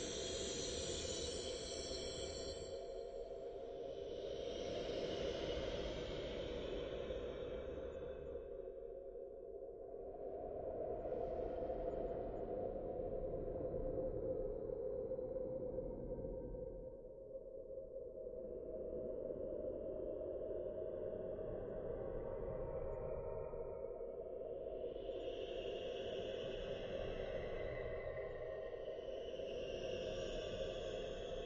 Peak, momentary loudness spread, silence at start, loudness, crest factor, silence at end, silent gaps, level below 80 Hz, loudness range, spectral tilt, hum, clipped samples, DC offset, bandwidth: -30 dBFS; 7 LU; 0 s; -46 LUFS; 16 dB; 0 s; none; -56 dBFS; 4 LU; -4.5 dB/octave; none; under 0.1%; under 0.1%; 9.4 kHz